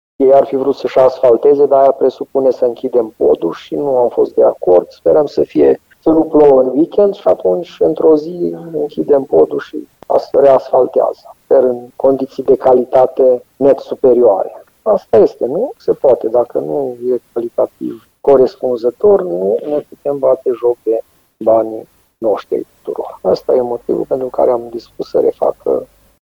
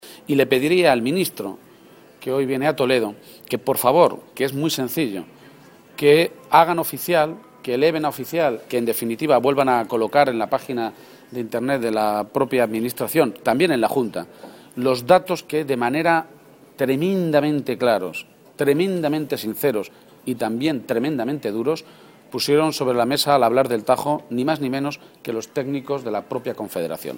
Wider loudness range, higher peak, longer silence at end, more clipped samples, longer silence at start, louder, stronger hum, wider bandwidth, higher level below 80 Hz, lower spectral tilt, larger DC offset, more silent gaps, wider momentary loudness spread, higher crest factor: about the same, 5 LU vs 3 LU; about the same, 0 dBFS vs 0 dBFS; first, 0.4 s vs 0 s; neither; first, 0.2 s vs 0.05 s; first, -13 LUFS vs -21 LUFS; neither; second, 7 kHz vs 17 kHz; first, -52 dBFS vs -64 dBFS; first, -8 dB/octave vs -5 dB/octave; neither; neither; about the same, 10 LU vs 12 LU; second, 12 dB vs 20 dB